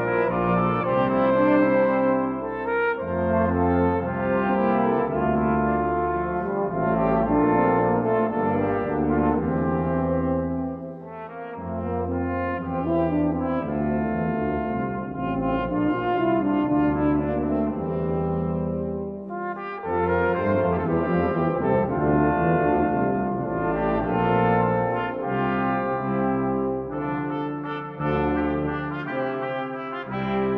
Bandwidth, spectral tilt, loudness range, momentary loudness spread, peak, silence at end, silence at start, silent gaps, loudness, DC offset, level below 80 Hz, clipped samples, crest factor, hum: 5 kHz; -11 dB/octave; 4 LU; 8 LU; -8 dBFS; 0 s; 0 s; none; -24 LUFS; under 0.1%; -44 dBFS; under 0.1%; 16 dB; none